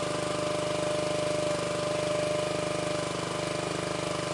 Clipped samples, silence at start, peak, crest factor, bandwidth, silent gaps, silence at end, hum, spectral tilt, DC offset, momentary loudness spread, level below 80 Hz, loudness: under 0.1%; 0 s; -18 dBFS; 12 dB; 11.5 kHz; none; 0 s; 50 Hz at -50 dBFS; -4 dB/octave; under 0.1%; 2 LU; -56 dBFS; -30 LUFS